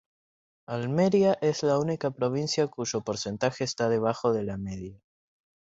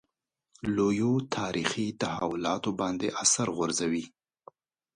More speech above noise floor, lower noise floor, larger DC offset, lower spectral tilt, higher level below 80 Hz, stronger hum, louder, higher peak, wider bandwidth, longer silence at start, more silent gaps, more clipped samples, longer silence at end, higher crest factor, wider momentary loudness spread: first, over 63 dB vs 54 dB; first, under -90 dBFS vs -82 dBFS; neither; first, -5.5 dB/octave vs -3.5 dB/octave; about the same, -60 dBFS vs -62 dBFS; neither; about the same, -27 LUFS vs -29 LUFS; about the same, -10 dBFS vs -8 dBFS; second, 8 kHz vs 11.5 kHz; about the same, 0.7 s vs 0.65 s; neither; neither; about the same, 0.85 s vs 0.9 s; about the same, 18 dB vs 22 dB; first, 12 LU vs 7 LU